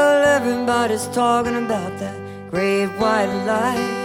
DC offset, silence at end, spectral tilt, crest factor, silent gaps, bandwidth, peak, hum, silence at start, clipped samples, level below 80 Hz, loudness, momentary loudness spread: under 0.1%; 0 s; -4.5 dB/octave; 14 dB; none; 16.5 kHz; -4 dBFS; none; 0 s; under 0.1%; -52 dBFS; -19 LUFS; 11 LU